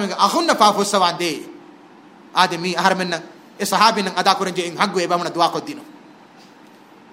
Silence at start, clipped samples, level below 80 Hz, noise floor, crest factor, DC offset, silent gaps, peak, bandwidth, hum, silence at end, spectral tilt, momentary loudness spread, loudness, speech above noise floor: 0 s; under 0.1%; -70 dBFS; -46 dBFS; 20 dB; under 0.1%; none; 0 dBFS; 16 kHz; none; 1.2 s; -3 dB/octave; 13 LU; -18 LUFS; 27 dB